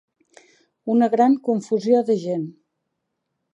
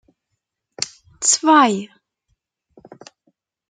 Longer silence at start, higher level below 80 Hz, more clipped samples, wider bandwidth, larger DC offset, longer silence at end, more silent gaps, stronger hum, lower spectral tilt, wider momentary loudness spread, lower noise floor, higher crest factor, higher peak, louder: about the same, 0.85 s vs 0.8 s; second, -78 dBFS vs -68 dBFS; neither; second, 8.2 kHz vs 9.8 kHz; neither; second, 1.05 s vs 1.85 s; neither; neither; first, -7.5 dB/octave vs -2 dB/octave; second, 12 LU vs 15 LU; about the same, -77 dBFS vs -77 dBFS; about the same, 18 dB vs 20 dB; about the same, -4 dBFS vs -2 dBFS; second, -20 LUFS vs -17 LUFS